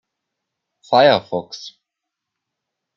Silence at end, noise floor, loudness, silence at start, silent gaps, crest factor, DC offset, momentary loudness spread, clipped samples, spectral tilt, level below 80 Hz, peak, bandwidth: 1.25 s; -82 dBFS; -16 LUFS; 0.9 s; none; 20 dB; under 0.1%; 21 LU; under 0.1%; -5 dB/octave; -70 dBFS; -2 dBFS; 7.4 kHz